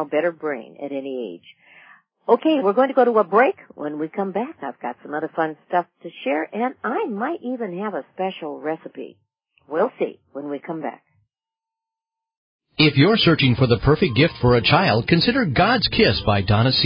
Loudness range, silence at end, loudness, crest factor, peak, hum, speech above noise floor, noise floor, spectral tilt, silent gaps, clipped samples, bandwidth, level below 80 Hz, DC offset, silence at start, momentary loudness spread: 12 LU; 0 s; -20 LUFS; 18 dB; -2 dBFS; none; 69 dB; -89 dBFS; -10.5 dB/octave; 12.37-12.59 s; under 0.1%; 5.4 kHz; -44 dBFS; under 0.1%; 0 s; 15 LU